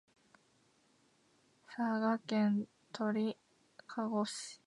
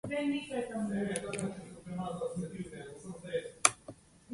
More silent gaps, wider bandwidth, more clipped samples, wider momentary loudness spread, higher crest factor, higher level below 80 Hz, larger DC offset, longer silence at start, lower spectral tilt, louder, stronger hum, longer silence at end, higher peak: neither; about the same, 11.5 kHz vs 11.5 kHz; neither; second, 14 LU vs 18 LU; second, 18 dB vs 32 dB; second, -88 dBFS vs -64 dBFS; neither; first, 1.7 s vs 0.05 s; first, -5.5 dB/octave vs -3.5 dB/octave; about the same, -37 LUFS vs -35 LUFS; neither; about the same, 0.1 s vs 0 s; second, -22 dBFS vs -4 dBFS